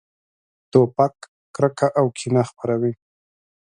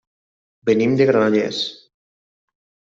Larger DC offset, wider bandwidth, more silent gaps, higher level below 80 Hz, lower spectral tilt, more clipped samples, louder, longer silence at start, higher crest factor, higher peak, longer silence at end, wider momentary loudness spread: neither; first, 10.5 kHz vs 7.8 kHz; first, 1.28-1.54 s vs none; about the same, -62 dBFS vs -64 dBFS; about the same, -7 dB/octave vs -6 dB/octave; neither; second, -21 LUFS vs -18 LUFS; about the same, 0.75 s vs 0.65 s; first, 22 dB vs 16 dB; first, 0 dBFS vs -4 dBFS; second, 0.75 s vs 1.2 s; second, 7 LU vs 11 LU